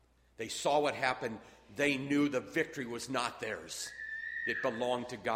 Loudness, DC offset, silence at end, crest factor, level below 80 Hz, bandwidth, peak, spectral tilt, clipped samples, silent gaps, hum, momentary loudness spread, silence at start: -35 LUFS; under 0.1%; 0 s; 20 dB; -68 dBFS; 16 kHz; -16 dBFS; -4 dB/octave; under 0.1%; none; none; 10 LU; 0.4 s